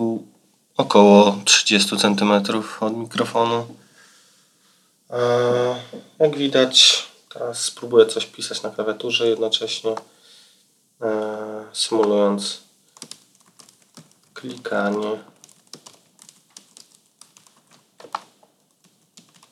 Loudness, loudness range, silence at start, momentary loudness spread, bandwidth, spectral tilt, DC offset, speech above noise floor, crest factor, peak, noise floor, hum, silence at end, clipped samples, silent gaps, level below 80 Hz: -18 LUFS; 14 LU; 0 s; 21 LU; 13.5 kHz; -3 dB/octave; under 0.1%; 42 dB; 22 dB; 0 dBFS; -60 dBFS; none; 1.3 s; under 0.1%; none; -86 dBFS